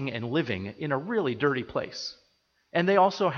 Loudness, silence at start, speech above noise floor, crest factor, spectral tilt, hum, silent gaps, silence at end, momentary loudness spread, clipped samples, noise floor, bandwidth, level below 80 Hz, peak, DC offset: -28 LUFS; 0 s; 43 dB; 18 dB; -6 dB/octave; none; none; 0 s; 12 LU; under 0.1%; -70 dBFS; 7 kHz; -64 dBFS; -10 dBFS; under 0.1%